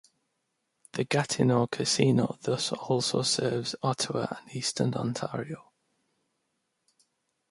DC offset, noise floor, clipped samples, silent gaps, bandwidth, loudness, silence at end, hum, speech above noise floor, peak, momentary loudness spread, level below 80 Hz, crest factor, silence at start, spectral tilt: under 0.1%; -79 dBFS; under 0.1%; none; 11.5 kHz; -28 LUFS; 1.9 s; none; 51 dB; -10 dBFS; 10 LU; -68 dBFS; 20 dB; 0.95 s; -4.5 dB/octave